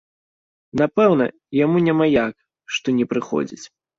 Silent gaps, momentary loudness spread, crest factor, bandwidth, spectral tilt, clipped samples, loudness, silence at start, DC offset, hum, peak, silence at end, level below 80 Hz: none; 11 LU; 16 dB; 7.8 kHz; -6.5 dB/octave; under 0.1%; -20 LUFS; 0.75 s; under 0.1%; none; -4 dBFS; 0.3 s; -58 dBFS